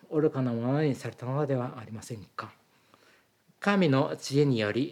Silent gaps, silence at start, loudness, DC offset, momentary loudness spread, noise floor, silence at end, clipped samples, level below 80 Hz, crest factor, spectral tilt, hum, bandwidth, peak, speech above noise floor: none; 0.1 s; -28 LUFS; under 0.1%; 16 LU; -65 dBFS; 0 s; under 0.1%; -78 dBFS; 18 dB; -6.5 dB/octave; none; 14 kHz; -10 dBFS; 37 dB